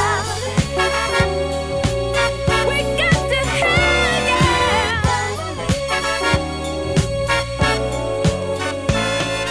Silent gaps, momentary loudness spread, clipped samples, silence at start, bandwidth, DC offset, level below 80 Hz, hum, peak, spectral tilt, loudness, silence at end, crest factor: none; 7 LU; under 0.1%; 0 s; 11 kHz; under 0.1%; -30 dBFS; none; -2 dBFS; -4.5 dB/octave; -18 LUFS; 0 s; 16 dB